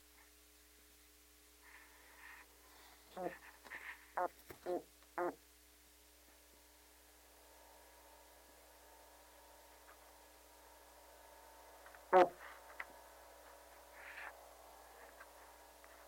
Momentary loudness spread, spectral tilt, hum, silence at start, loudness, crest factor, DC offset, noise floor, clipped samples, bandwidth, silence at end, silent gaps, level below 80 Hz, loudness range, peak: 20 LU; -4 dB/octave; none; 1.65 s; -41 LUFS; 30 dB; under 0.1%; -66 dBFS; under 0.1%; 16.5 kHz; 0 s; none; -74 dBFS; 21 LU; -16 dBFS